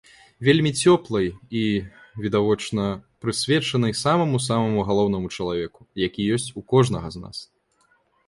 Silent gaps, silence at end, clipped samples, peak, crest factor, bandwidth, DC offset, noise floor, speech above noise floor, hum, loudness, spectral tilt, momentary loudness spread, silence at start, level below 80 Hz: none; 0.85 s; under 0.1%; -4 dBFS; 20 dB; 11.5 kHz; under 0.1%; -64 dBFS; 42 dB; none; -22 LUFS; -5.5 dB/octave; 11 LU; 0.4 s; -50 dBFS